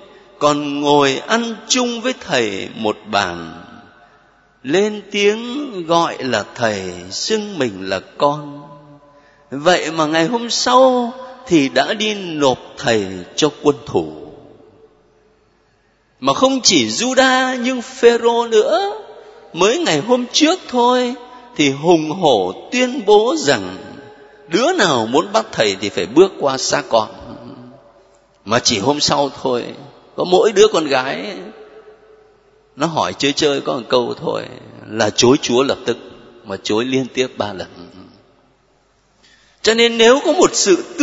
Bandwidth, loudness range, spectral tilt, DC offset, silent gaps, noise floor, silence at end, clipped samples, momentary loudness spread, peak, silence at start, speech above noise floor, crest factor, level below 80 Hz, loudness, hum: 8 kHz; 6 LU; -3.5 dB/octave; under 0.1%; none; -57 dBFS; 0 s; under 0.1%; 14 LU; 0 dBFS; 0.4 s; 42 dB; 18 dB; -56 dBFS; -16 LUFS; none